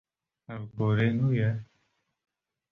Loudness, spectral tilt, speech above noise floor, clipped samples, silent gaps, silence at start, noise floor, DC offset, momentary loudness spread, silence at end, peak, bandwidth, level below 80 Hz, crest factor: -28 LUFS; -9.5 dB/octave; 48 dB; under 0.1%; none; 0.5 s; -75 dBFS; under 0.1%; 16 LU; 1.05 s; -14 dBFS; 4 kHz; -60 dBFS; 16 dB